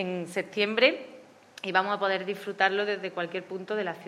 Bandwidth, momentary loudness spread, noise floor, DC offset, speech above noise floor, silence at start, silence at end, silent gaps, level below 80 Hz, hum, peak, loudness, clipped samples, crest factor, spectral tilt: 14 kHz; 12 LU; -50 dBFS; under 0.1%; 22 dB; 0 s; 0 s; none; -88 dBFS; none; -6 dBFS; -28 LUFS; under 0.1%; 24 dB; -4.5 dB/octave